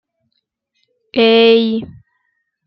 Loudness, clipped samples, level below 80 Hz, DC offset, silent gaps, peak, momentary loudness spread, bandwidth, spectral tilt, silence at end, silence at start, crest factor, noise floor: -12 LUFS; under 0.1%; -58 dBFS; under 0.1%; none; -2 dBFS; 14 LU; 5.8 kHz; -7 dB/octave; 0.8 s; 1.15 s; 16 dB; -70 dBFS